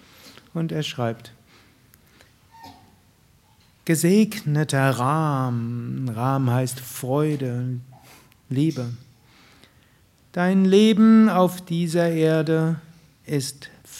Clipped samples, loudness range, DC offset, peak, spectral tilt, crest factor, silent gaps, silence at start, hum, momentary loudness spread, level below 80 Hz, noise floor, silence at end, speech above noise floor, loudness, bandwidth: under 0.1%; 11 LU; under 0.1%; -4 dBFS; -6.5 dB/octave; 18 dB; none; 0.25 s; none; 16 LU; -66 dBFS; -57 dBFS; 0 s; 37 dB; -21 LUFS; 16 kHz